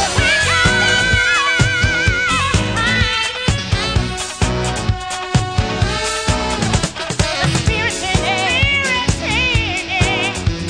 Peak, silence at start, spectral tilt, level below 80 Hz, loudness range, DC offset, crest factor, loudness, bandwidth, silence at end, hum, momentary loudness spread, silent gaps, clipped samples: 0 dBFS; 0 s; -3.5 dB/octave; -26 dBFS; 4 LU; 0.2%; 16 dB; -15 LUFS; 10.5 kHz; 0 s; none; 6 LU; none; under 0.1%